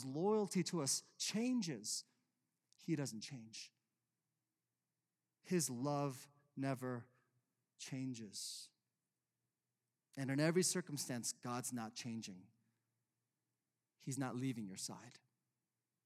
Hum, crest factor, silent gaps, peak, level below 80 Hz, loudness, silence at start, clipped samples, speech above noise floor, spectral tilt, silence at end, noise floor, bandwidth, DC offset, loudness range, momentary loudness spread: none; 20 dB; none; -24 dBFS; under -90 dBFS; -42 LUFS; 0 s; under 0.1%; over 47 dB; -4 dB/octave; 0.9 s; under -90 dBFS; 16 kHz; under 0.1%; 7 LU; 16 LU